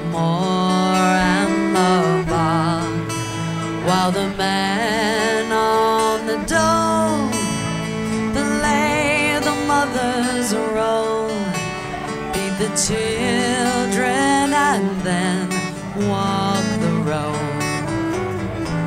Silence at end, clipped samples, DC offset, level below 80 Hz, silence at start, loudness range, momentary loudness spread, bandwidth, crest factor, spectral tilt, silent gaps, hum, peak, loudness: 0 s; under 0.1%; under 0.1%; -42 dBFS; 0 s; 3 LU; 7 LU; 16 kHz; 16 dB; -4.5 dB/octave; none; none; -4 dBFS; -19 LUFS